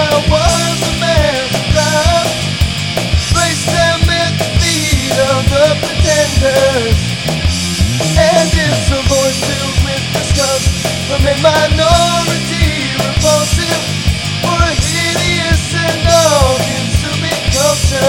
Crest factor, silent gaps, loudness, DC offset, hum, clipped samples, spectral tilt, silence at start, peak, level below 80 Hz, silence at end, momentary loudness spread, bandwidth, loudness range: 12 dB; none; -12 LUFS; under 0.1%; none; under 0.1%; -4 dB/octave; 0 s; 0 dBFS; -22 dBFS; 0 s; 5 LU; 17.5 kHz; 1 LU